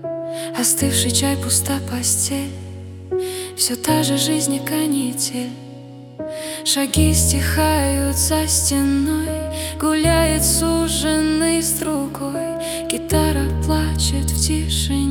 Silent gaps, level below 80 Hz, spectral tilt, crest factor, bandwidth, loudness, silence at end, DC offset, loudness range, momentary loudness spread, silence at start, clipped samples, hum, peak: none; -32 dBFS; -4 dB/octave; 18 dB; 18 kHz; -18 LUFS; 0 s; under 0.1%; 3 LU; 11 LU; 0 s; under 0.1%; none; 0 dBFS